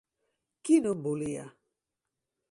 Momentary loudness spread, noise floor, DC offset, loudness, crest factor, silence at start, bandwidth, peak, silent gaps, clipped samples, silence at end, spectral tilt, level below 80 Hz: 15 LU; -87 dBFS; under 0.1%; -29 LUFS; 20 dB; 0.65 s; 11.5 kHz; -12 dBFS; none; under 0.1%; 1 s; -6.5 dB/octave; -72 dBFS